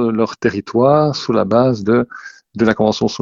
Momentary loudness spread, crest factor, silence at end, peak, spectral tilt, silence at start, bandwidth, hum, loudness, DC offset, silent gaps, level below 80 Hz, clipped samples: 8 LU; 16 dB; 0.05 s; 0 dBFS; -6.5 dB/octave; 0 s; 7.4 kHz; none; -15 LUFS; under 0.1%; none; -50 dBFS; under 0.1%